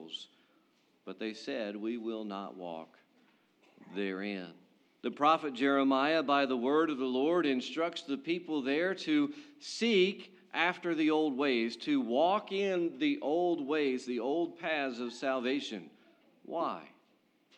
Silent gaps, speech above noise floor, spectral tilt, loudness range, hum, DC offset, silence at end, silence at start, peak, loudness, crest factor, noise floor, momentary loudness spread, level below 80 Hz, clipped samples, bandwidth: none; 38 dB; -5 dB/octave; 11 LU; none; under 0.1%; 0.7 s; 0 s; -14 dBFS; -32 LUFS; 20 dB; -71 dBFS; 14 LU; under -90 dBFS; under 0.1%; 9.4 kHz